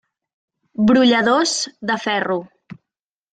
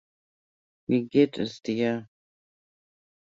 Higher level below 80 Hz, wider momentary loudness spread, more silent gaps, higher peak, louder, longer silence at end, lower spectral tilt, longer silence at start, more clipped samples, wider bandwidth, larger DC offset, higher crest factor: first, -60 dBFS vs -68 dBFS; about the same, 11 LU vs 11 LU; neither; first, -2 dBFS vs -8 dBFS; first, -17 LUFS vs -26 LUFS; second, 0.6 s vs 1.3 s; second, -3.5 dB/octave vs -7 dB/octave; about the same, 0.8 s vs 0.9 s; neither; first, 9.4 kHz vs 7.8 kHz; neither; about the same, 18 dB vs 22 dB